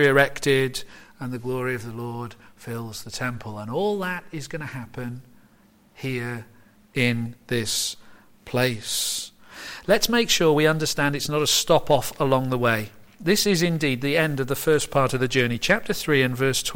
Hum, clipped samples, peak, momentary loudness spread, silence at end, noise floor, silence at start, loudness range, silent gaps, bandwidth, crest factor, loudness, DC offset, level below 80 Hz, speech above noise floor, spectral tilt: none; under 0.1%; -4 dBFS; 15 LU; 0 s; -57 dBFS; 0 s; 10 LU; none; 16.5 kHz; 20 dB; -23 LUFS; under 0.1%; -48 dBFS; 33 dB; -4 dB/octave